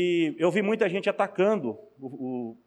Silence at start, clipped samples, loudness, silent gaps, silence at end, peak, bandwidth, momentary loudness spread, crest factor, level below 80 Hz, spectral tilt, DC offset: 0 s; under 0.1%; -26 LUFS; none; 0.15 s; -12 dBFS; 10.5 kHz; 12 LU; 14 dB; -76 dBFS; -6.5 dB/octave; under 0.1%